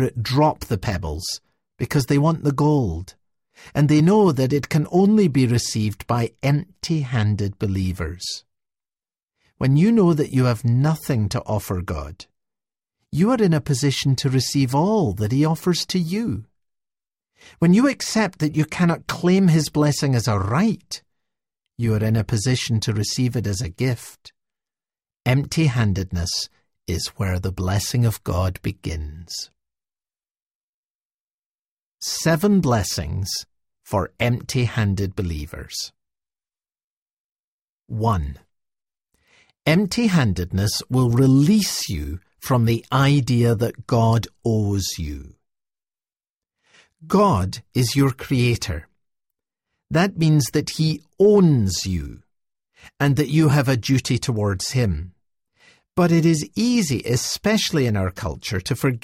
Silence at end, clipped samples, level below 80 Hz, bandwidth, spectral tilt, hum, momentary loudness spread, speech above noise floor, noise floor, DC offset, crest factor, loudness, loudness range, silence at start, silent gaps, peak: 0.05 s; under 0.1%; -42 dBFS; 16 kHz; -6 dB/octave; none; 12 LU; over 70 dB; under -90 dBFS; under 0.1%; 16 dB; -21 LUFS; 7 LU; 0 s; 9.23-9.28 s, 30.31-30.35 s, 30.42-30.99 s, 31.05-31.55 s, 31.68-31.98 s, 36.84-37.06 s, 37.13-37.76 s, 46.30-46.34 s; -4 dBFS